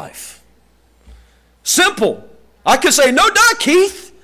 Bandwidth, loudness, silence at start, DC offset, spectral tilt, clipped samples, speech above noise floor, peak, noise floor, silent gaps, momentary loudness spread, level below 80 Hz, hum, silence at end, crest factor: 16 kHz; -12 LUFS; 0 s; under 0.1%; -1 dB/octave; under 0.1%; 41 dB; -4 dBFS; -53 dBFS; none; 21 LU; -48 dBFS; none; 0.2 s; 12 dB